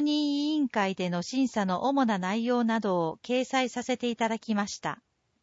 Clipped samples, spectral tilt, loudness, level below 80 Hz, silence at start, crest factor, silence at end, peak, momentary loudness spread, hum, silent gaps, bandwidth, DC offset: under 0.1%; -5 dB/octave; -28 LUFS; -72 dBFS; 0 s; 14 dB; 0.5 s; -14 dBFS; 4 LU; none; none; 8 kHz; under 0.1%